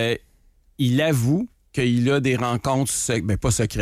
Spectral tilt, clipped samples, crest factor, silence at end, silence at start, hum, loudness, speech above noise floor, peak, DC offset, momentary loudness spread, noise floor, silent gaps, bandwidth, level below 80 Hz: -5 dB/octave; under 0.1%; 12 dB; 0 s; 0 s; none; -22 LUFS; 36 dB; -10 dBFS; under 0.1%; 6 LU; -57 dBFS; none; 16 kHz; -42 dBFS